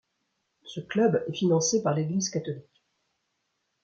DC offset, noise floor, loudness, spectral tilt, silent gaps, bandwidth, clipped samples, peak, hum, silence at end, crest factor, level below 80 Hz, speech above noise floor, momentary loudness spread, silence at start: under 0.1%; -78 dBFS; -26 LUFS; -5 dB/octave; none; 9 kHz; under 0.1%; -12 dBFS; none; 1.2 s; 16 dB; -70 dBFS; 52 dB; 16 LU; 0.65 s